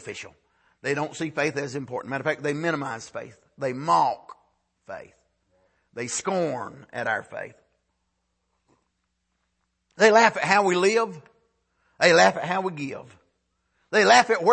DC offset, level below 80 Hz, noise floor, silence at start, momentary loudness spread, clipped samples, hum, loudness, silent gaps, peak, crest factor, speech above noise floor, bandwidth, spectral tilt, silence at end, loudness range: under 0.1%; -70 dBFS; -76 dBFS; 0.05 s; 22 LU; under 0.1%; none; -23 LUFS; none; -4 dBFS; 22 dB; 53 dB; 8.8 kHz; -3.5 dB/octave; 0 s; 11 LU